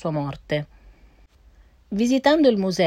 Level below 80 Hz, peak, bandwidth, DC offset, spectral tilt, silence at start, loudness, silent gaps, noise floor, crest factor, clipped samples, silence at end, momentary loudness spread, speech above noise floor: -52 dBFS; -6 dBFS; 15.5 kHz; under 0.1%; -6 dB/octave; 0 s; -21 LUFS; none; -53 dBFS; 18 dB; under 0.1%; 0 s; 13 LU; 33 dB